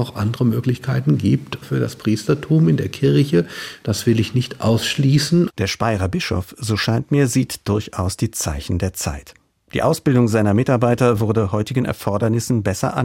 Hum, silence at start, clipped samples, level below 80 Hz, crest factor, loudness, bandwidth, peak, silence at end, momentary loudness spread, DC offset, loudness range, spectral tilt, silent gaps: none; 0 s; under 0.1%; -44 dBFS; 16 dB; -19 LUFS; 16.5 kHz; -4 dBFS; 0 s; 7 LU; under 0.1%; 3 LU; -6 dB/octave; none